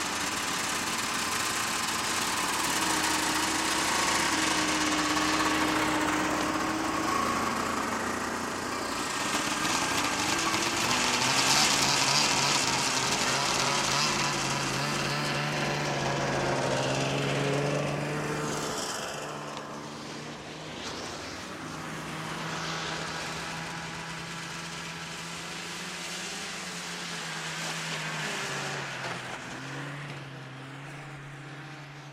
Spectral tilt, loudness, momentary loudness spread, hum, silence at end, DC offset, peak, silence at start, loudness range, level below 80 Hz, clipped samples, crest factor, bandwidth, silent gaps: -2.5 dB/octave; -28 LUFS; 13 LU; none; 0 s; under 0.1%; -10 dBFS; 0 s; 12 LU; -58 dBFS; under 0.1%; 22 dB; 16 kHz; none